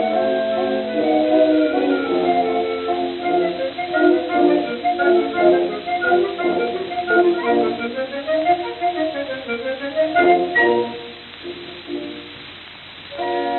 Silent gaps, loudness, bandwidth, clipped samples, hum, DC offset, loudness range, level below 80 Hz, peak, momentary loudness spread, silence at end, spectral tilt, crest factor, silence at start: none; -19 LUFS; 4.3 kHz; under 0.1%; none; under 0.1%; 3 LU; -58 dBFS; -4 dBFS; 16 LU; 0 s; -8 dB/octave; 16 dB; 0 s